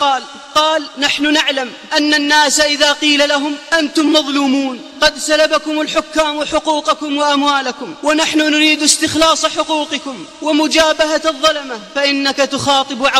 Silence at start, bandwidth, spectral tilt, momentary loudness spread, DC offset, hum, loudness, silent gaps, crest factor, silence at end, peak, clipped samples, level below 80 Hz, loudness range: 0 s; 15.5 kHz; -1.5 dB/octave; 7 LU; under 0.1%; none; -13 LUFS; none; 14 dB; 0 s; 0 dBFS; under 0.1%; -48 dBFS; 2 LU